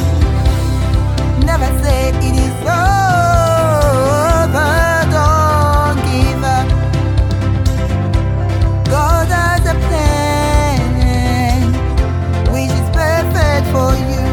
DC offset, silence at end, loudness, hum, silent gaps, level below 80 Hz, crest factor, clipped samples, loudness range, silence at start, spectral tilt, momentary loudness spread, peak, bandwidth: under 0.1%; 0 s; -13 LUFS; none; none; -18 dBFS; 12 dB; under 0.1%; 2 LU; 0 s; -6 dB/octave; 4 LU; 0 dBFS; 18 kHz